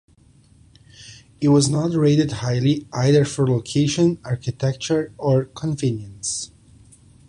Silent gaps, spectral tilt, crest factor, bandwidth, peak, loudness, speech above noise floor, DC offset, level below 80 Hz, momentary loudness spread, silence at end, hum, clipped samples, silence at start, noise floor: none; -6 dB/octave; 16 dB; 11 kHz; -6 dBFS; -20 LUFS; 33 dB; under 0.1%; -52 dBFS; 10 LU; 0.85 s; none; under 0.1%; 1 s; -53 dBFS